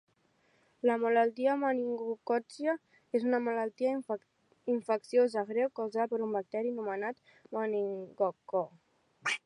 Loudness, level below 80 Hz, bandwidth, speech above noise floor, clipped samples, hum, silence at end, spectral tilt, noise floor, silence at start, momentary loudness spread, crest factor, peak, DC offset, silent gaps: -33 LUFS; -88 dBFS; 10.5 kHz; 39 dB; under 0.1%; none; 0.1 s; -5 dB/octave; -71 dBFS; 0.85 s; 10 LU; 16 dB; -16 dBFS; under 0.1%; none